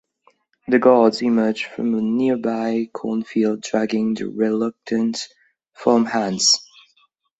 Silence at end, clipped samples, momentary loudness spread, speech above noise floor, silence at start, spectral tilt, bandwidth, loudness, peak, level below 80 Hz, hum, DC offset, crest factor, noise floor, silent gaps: 0.75 s; under 0.1%; 9 LU; 43 dB; 0.7 s; -4 dB/octave; 8.2 kHz; -20 LUFS; -2 dBFS; -64 dBFS; none; under 0.1%; 18 dB; -62 dBFS; none